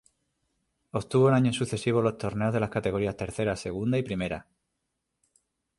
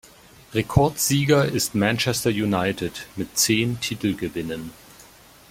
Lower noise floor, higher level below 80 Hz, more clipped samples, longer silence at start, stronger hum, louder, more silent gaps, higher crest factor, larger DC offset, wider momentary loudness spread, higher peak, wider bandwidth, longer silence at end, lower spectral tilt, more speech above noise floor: first, -81 dBFS vs -49 dBFS; second, -54 dBFS vs -46 dBFS; neither; first, 0.95 s vs 0.5 s; neither; second, -28 LUFS vs -22 LUFS; neither; about the same, 18 dB vs 20 dB; neither; about the same, 10 LU vs 11 LU; second, -10 dBFS vs -4 dBFS; second, 11.5 kHz vs 16.5 kHz; first, 1.35 s vs 0.45 s; first, -6.5 dB/octave vs -4 dB/octave; first, 55 dB vs 27 dB